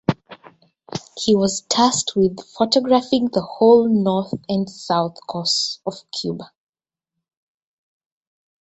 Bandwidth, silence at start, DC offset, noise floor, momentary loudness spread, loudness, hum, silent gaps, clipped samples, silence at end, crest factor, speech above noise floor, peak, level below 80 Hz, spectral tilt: 8.2 kHz; 0.1 s; under 0.1%; -84 dBFS; 14 LU; -19 LUFS; none; none; under 0.1%; 2.15 s; 20 dB; 65 dB; -2 dBFS; -58 dBFS; -4.5 dB/octave